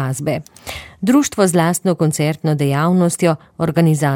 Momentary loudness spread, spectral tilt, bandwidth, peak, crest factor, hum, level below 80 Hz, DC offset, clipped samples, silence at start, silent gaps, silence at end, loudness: 9 LU; -6 dB/octave; 17 kHz; -2 dBFS; 14 dB; none; -50 dBFS; under 0.1%; under 0.1%; 0 s; none; 0 s; -16 LUFS